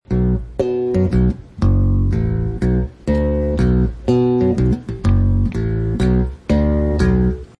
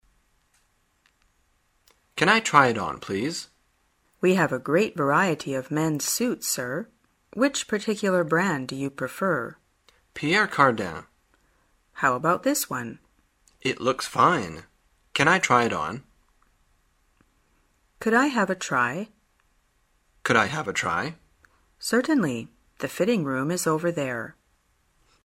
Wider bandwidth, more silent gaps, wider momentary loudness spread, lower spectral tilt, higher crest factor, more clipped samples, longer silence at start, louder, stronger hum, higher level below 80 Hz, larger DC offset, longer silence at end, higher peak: second, 10 kHz vs 16 kHz; neither; second, 5 LU vs 15 LU; first, -9.5 dB/octave vs -4 dB/octave; second, 12 dB vs 26 dB; neither; second, 0.1 s vs 2.15 s; first, -18 LUFS vs -24 LUFS; neither; first, -22 dBFS vs -62 dBFS; neither; second, 0.15 s vs 0.95 s; about the same, -4 dBFS vs -2 dBFS